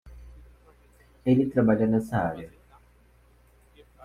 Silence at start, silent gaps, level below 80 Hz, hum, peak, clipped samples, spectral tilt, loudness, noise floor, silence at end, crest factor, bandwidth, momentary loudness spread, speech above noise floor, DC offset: 0.05 s; none; -52 dBFS; none; -10 dBFS; under 0.1%; -9 dB/octave; -25 LUFS; -59 dBFS; 1.55 s; 18 dB; 13 kHz; 14 LU; 35 dB; under 0.1%